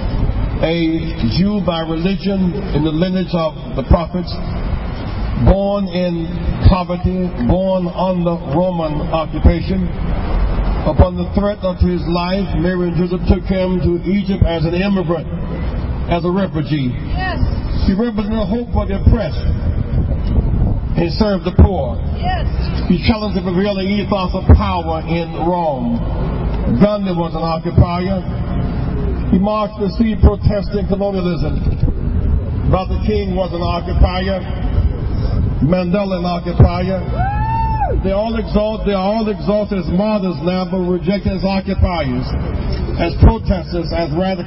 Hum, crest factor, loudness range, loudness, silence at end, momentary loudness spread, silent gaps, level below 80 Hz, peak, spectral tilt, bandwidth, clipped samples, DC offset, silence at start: none; 16 dB; 2 LU; -17 LUFS; 0 s; 6 LU; none; -20 dBFS; 0 dBFS; -12 dB/octave; 5.8 kHz; under 0.1%; under 0.1%; 0 s